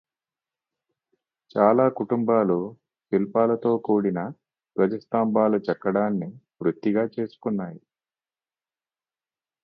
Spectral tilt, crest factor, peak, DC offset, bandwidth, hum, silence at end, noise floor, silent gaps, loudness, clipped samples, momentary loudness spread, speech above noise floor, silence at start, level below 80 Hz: -11 dB/octave; 22 dB; -4 dBFS; under 0.1%; 5.6 kHz; none; 1.85 s; under -90 dBFS; none; -24 LUFS; under 0.1%; 10 LU; over 67 dB; 1.55 s; -68 dBFS